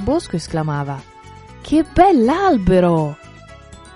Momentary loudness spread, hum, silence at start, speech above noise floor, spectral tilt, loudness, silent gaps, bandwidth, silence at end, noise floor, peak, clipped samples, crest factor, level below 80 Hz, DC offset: 16 LU; none; 0 s; 25 dB; -7 dB/octave; -16 LUFS; none; 11.5 kHz; 0.2 s; -40 dBFS; 0 dBFS; under 0.1%; 16 dB; -36 dBFS; under 0.1%